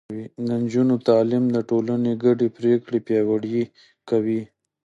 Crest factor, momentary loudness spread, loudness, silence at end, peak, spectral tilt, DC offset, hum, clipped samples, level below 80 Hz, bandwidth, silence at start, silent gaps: 16 dB; 8 LU; -22 LUFS; 0.4 s; -6 dBFS; -8.5 dB/octave; under 0.1%; none; under 0.1%; -66 dBFS; 7.6 kHz; 0.1 s; none